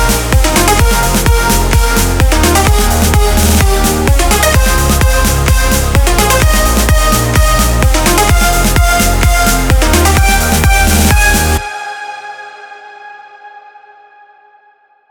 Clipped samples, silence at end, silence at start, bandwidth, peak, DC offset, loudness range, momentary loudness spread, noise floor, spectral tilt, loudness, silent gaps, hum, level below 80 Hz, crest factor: under 0.1%; 1.5 s; 0 s; over 20 kHz; 0 dBFS; under 0.1%; 5 LU; 4 LU; -49 dBFS; -4 dB/octave; -10 LUFS; none; none; -12 dBFS; 10 dB